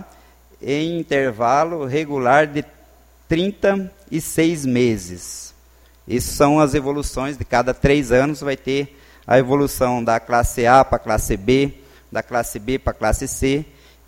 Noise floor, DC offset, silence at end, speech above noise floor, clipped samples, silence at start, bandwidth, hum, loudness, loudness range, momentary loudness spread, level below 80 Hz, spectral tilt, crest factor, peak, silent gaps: -50 dBFS; under 0.1%; 0.45 s; 32 dB; under 0.1%; 0 s; 16.5 kHz; none; -19 LUFS; 4 LU; 11 LU; -34 dBFS; -5.5 dB/octave; 20 dB; 0 dBFS; none